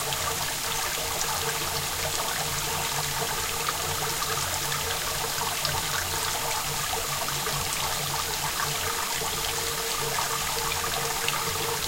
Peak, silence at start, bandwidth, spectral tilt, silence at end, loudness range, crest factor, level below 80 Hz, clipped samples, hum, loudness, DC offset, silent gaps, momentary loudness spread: -8 dBFS; 0 s; 16 kHz; -1 dB/octave; 0 s; 0 LU; 20 dB; -46 dBFS; under 0.1%; none; -26 LUFS; under 0.1%; none; 1 LU